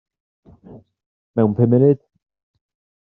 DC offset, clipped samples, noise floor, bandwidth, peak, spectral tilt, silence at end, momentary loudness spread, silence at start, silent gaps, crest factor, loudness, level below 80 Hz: under 0.1%; under 0.1%; -44 dBFS; 3.6 kHz; -4 dBFS; -12 dB/octave; 1.05 s; 10 LU; 0.7 s; 1.06-1.34 s; 18 dB; -17 LUFS; -60 dBFS